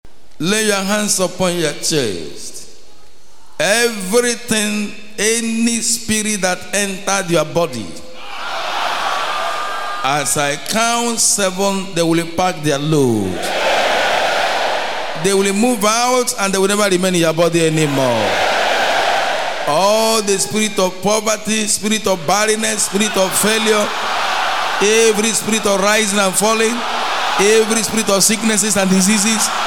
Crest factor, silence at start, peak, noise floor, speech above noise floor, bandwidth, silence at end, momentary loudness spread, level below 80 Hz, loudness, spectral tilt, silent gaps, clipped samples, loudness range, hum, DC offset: 14 dB; 0.05 s; -2 dBFS; -48 dBFS; 32 dB; 17.5 kHz; 0 s; 7 LU; -52 dBFS; -15 LUFS; -3 dB/octave; none; under 0.1%; 5 LU; none; 3%